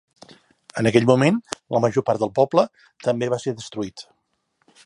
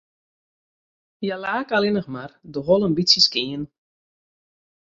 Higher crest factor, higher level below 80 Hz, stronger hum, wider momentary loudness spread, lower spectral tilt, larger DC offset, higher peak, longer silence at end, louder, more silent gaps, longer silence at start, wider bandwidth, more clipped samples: about the same, 20 dB vs 22 dB; about the same, -60 dBFS vs -60 dBFS; neither; second, 14 LU vs 18 LU; first, -6 dB/octave vs -4 dB/octave; neither; about the same, -2 dBFS vs -2 dBFS; second, 0.85 s vs 1.3 s; about the same, -21 LUFS vs -20 LUFS; neither; second, 0.75 s vs 1.2 s; first, 11.5 kHz vs 7.8 kHz; neither